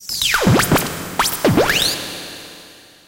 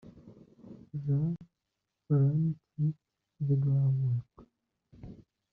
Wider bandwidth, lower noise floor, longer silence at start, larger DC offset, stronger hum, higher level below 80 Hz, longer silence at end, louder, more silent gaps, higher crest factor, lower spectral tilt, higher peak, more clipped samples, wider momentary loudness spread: first, 17 kHz vs 1.6 kHz; second, -43 dBFS vs -85 dBFS; about the same, 0 s vs 0.05 s; neither; first, 50 Hz at -45 dBFS vs none; first, -38 dBFS vs -66 dBFS; about the same, 0.35 s vs 0.35 s; first, -16 LUFS vs -31 LUFS; neither; about the same, 16 dB vs 14 dB; second, -3.5 dB/octave vs -13.5 dB/octave; first, -2 dBFS vs -18 dBFS; neither; second, 17 LU vs 24 LU